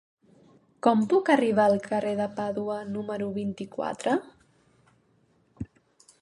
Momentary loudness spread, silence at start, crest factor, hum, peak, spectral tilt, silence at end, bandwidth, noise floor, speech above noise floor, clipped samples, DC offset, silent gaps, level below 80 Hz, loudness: 12 LU; 0.85 s; 22 dB; none; -8 dBFS; -6.5 dB/octave; 0.55 s; 11 kHz; -66 dBFS; 40 dB; under 0.1%; under 0.1%; none; -62 dBFS; -26 LUFS